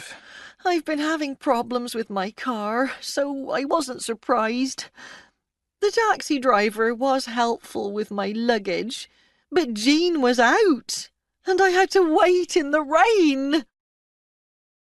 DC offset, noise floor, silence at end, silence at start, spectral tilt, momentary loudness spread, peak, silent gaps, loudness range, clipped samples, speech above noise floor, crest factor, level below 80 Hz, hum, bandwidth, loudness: under 0.1%; -79 dBFS; 1.25 s; 0 s; -3 dB/octave; 11 LU; -4 dBFS; none; 6 LU; under 0.1%; 57 dB; 18 dB; -62 dBFS; none; 12 kHz; -22 LUFS